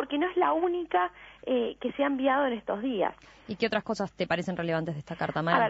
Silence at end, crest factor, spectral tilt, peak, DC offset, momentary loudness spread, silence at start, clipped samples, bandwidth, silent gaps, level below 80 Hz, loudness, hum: 0 s; 20 dB; -6.5 dB/octave; -8 dBFS; under 0.1%; 7 LU; 0 s; under 0.1%; 8 kHz; none; -62 dBFS; -29 LUFS; none